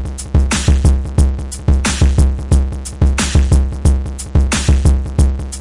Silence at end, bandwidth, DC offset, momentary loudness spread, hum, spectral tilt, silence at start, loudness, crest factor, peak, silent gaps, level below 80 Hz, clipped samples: 0 s; 11.5 kHz; under 0.1%; 4 LU; none; -5 dB/octave; 0 s; -15 LUFS; 10 dB; -4 dBFS; none; -14 dBFS; under 0.1%